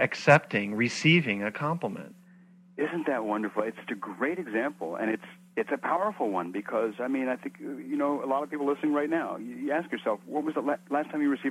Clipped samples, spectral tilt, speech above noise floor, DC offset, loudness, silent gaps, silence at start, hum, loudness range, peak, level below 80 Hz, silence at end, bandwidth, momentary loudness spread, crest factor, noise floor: under 0.1%; -6 dB/octave; 27 dB; under 0.1%; -29 LUFS; none; 0 s; none; 4 LU; -4 dBFS; -76 dBFS; 0 s; 13.5 kHz; 13 LU; 24 dB; -55 dBFS